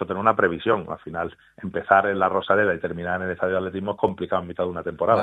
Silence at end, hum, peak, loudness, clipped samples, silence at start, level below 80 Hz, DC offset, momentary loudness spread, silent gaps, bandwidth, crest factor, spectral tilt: 0 s; none; -2 dBFS; -23 LUFS; under 0.1%; 0 s; -60 dBFS; under 0.1%; 12 LU; none; 8 kHz; 22 dB; -8 dB/octave